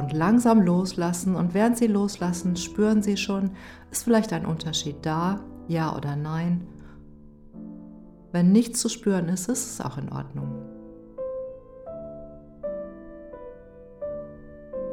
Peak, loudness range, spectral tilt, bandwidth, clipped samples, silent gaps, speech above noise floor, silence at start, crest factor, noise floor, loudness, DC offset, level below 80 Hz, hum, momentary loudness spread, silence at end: -8 dBFS; 14 LU; -5.5 dB/octave; 16.5 kHz; under 0.1%; none; 23 dB; 0 s; 18 dB; -47 dBFS; -25 LUFS; under 0.1%; -52 dBFS; none; 22 LU; 0 s